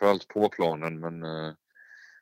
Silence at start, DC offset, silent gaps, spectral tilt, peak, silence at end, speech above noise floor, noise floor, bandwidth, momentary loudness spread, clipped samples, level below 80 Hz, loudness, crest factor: 0 s; under 0.1%; none; -6.5 dB/octave; -8 dBFS; 0.2 s; 24 dB; -54 dBFS; 16 kHz; 11 LU; under 0.1%; -74 dBFS; -29 LUFS; 22 dB